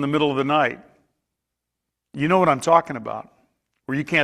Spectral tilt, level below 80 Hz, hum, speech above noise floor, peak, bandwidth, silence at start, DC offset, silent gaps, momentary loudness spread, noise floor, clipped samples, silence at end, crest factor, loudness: -5.5 dB/octave; -62 dBFS; none; 62 dB; -2 dBFS; 13.5 kHz; 0 s; under 0.1%; none; 19 LU; -82 dBFS; under 0.1%; 0 s; 20 dB; -20 LUFS